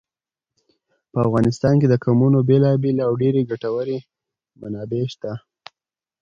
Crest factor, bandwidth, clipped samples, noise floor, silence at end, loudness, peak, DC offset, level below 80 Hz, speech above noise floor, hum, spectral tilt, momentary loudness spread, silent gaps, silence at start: 16 dB; 7.6 kHz; under 0.1%; -89 dBFS; 0.85 s; -19 LUFS; -4 dBFS; under 0.1%; -52 dBFS; 71 dB; none; -9 dB/octave; 15 LU; none; 1.15 s